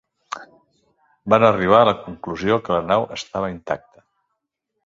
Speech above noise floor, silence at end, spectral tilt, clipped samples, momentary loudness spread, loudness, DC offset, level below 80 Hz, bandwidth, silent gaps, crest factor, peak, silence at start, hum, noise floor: 58 dB; 1.1 s; -6 dB/octave; under 0.1%; 20 LU; -19 LUFS; under 0.1%; -52 dBFS; 7.6 kHz; none; 20 dB; 0 dBFS; 0.3 s; none; -77 dBFS